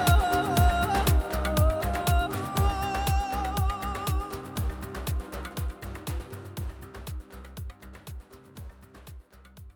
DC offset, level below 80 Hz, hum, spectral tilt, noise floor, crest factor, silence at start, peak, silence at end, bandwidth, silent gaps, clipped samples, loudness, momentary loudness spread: under 0.1%; -32 dBFS; none; -5.5 dB/octave; -49 dBFS; 18 dB; 0 s; -8 dBFS; 0.05 s; over 20 kHz; none; under 0.1%; -28 LUFS; 22 LU